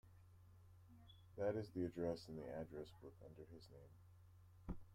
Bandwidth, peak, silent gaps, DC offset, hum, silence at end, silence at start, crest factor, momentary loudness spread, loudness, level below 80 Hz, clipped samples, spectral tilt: 16 kHz; -32 dBFS; none; under 0.1%; none; 0 s; 0.05 s; 20 dB; 23 LU; -49 LUFS; -68 dBFS; under 0.1%; -7.5 dB/octave